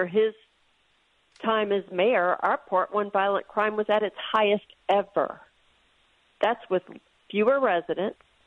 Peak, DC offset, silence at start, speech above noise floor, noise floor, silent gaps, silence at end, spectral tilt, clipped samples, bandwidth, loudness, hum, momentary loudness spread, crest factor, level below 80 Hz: -10 dBFS; under 0.1%; 0 s; 41 dB; -66 dBFS; none; 0.35 s; -6.5 dB/octave; under 0.1%; 5.8 kHz; -26 LUFS; none; 8 LU; 18 dB; -72 dBFS